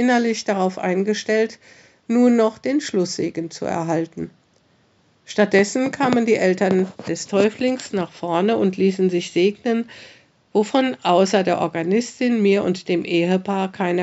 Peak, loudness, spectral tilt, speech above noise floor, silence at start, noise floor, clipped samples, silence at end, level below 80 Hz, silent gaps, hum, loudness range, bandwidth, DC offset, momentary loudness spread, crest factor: -2 dBFS; -20 LUFS; -5.5 dB/octave; 40 dB; 0 s; -59 dBFS; under 0.1%; 0 s; -68 dBFS; none; none; 3 LU; 8.2 kHz; under 0.1%; 9 LU; 18 dB